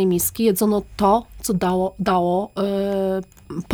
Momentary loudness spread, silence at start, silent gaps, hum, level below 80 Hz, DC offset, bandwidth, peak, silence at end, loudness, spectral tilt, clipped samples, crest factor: 6 LU; 0 s; none; none; -44 dBFS; under 0.1%; over 20 kHz; -6 dBFS; 0 s; -21 LUFS; -5.5 dB/octave; under 0.1%; 16 dB